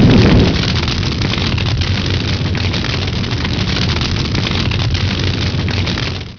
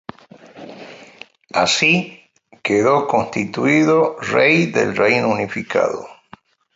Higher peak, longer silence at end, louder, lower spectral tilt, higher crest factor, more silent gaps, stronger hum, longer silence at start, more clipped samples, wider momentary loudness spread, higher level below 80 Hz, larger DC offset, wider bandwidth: about the same, -2 dBFS vs -2 dBFS; second, 0 s vs 0.65 s; about the same, -15 LUFS vs -16 LUFS; about the same, -5.5 dB/octave vs -4.5 dB/octave; second, 12 dB vs 18 dB; neither; neither; second, 0 s vs 0.55 s; neither; second, 6 LU vs 20 LU; first, -24 dBFS vs -58 dBFS; first, 0.3% vs under 0.1%; second, 5.4 kHz vs 8 kHz